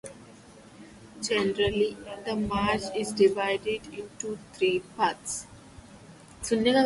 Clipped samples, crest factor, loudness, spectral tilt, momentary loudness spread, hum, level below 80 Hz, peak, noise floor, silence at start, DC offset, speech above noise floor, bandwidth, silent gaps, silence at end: under 0.1%; 18 dB; -28 LUFS; -4 dB/octave; 17 LU; none; -54 dBFS; -10 dBFS; -51 dBFS; 0.05 s; under 0.1%; 24 dB; 11.5 kHz; none; 0 s